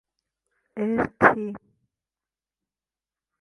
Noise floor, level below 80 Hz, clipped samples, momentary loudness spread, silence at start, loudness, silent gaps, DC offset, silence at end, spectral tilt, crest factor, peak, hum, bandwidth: under -90 dBFS; -58 dBFS; under 0.1%; 21 LU; 0.75 s; -22 LUFS; none; under 0.1%; 1.85 s; -8 dB/octave; 28 dB; 0 dBFS; none; 11 kHz